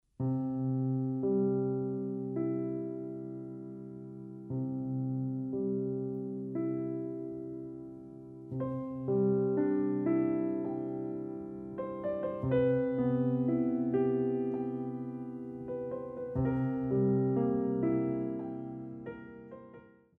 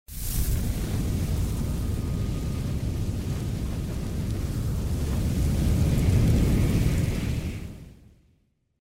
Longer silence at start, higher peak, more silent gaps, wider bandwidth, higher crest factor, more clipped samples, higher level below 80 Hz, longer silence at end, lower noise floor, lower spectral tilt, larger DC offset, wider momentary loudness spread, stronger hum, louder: about the same, 0.2 s vs 0.1 s; second, -18 dBFS vs -10 dBFS; neither; second, 3.7 kHz vs 16 kHz; about the same, 16 dB vs 16 dB; neither; second, -62 dBFS vs -30 dBFS; second, 0.3 s vs 0.95 s; second, -56 dBFS vs -67 dBFS; first, -12 dB/octave vs -6.5 dB/octave; neither; first, 15 LU vs 9 LU; neither; second, -34 LUFS vs -27 LUFS